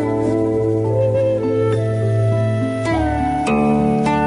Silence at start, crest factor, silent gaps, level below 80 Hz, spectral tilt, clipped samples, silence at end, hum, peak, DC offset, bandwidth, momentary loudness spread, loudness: 0 s; 10 dB; none; -36 dBFS; -8 dB/octave; under 0.1%; 0 s; none; -6 dBFS; under 0.1%; 11 kHz; 3 LU; -18 LUFS